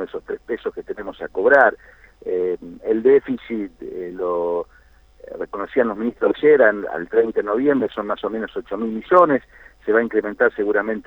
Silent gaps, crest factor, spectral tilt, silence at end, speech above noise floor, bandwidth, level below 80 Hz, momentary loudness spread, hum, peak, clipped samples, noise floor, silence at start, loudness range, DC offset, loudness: none; 18 dB; -7.5 dB/octave; 0.05 s; 32 dB; 4.1 kHz; -54 dBFS; 16 LU; none; -2 dBFS; under 0.1%; -51 dBFS; 0 s; 3 LU; under 0.1%; -20 LUFS